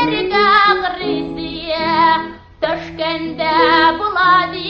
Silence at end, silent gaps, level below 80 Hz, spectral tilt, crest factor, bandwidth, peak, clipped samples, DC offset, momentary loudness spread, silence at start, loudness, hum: 0 s; none; -44 dBFS; -5.5 dB/octave; 16 dB; 7 kHz; 0 dBFS; under 0.1%; under 0.1%; 11 LU; 0 s; -15 LUFS; none